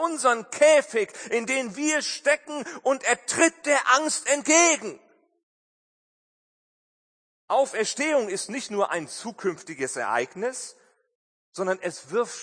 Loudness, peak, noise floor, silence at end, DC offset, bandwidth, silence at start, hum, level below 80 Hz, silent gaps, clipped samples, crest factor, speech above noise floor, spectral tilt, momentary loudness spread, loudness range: -24 LUFS; -4 dBFS; under -90 dBFS; 0 s; under 0.1%; 9.8 kHz; 0 s; none; -78 dBFS; 5.43-7.48 s, 11.15-11.52 s; under 0.1%; 22 dB; over 66 dB; -1.5 dB/octave; 12 LU; 8 LU